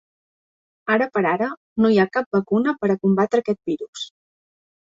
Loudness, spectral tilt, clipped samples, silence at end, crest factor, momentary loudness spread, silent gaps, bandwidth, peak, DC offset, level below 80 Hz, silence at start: -21 LUFS; -6.5 dB/octave; under 0.1%; 0.8 s; 16 dB; 12 LU; 1.57-1.76 s, 2.26-2.31 s, 3.88-3.93 s; 7.8 kHz; -6 dBFS; under 0.1%; -62 dBFS; 0.85 s